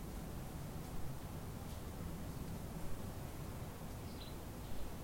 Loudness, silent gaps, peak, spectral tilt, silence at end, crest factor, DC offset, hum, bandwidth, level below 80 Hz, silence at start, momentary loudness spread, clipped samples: -48 LUFS; none; -30 dBFS; -5.5 dB/octave; 0 s; 14 dB; under 0.1%; none; 16.5 kHz; -52 dBFS; 0 s; 2 LU; under 0.1%